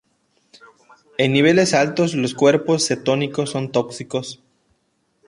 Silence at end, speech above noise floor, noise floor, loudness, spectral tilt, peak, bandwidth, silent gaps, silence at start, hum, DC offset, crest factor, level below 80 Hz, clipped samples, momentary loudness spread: 0.95 s; 49 dB; -67 dBFS; -18 LUFS; -4.5 dB/octave; -2 dBFS; 11.5 kHz; none; 1.2 s; none; under 0.1%; 18 dB; -62 dBFS; under 0.1%; 12 LU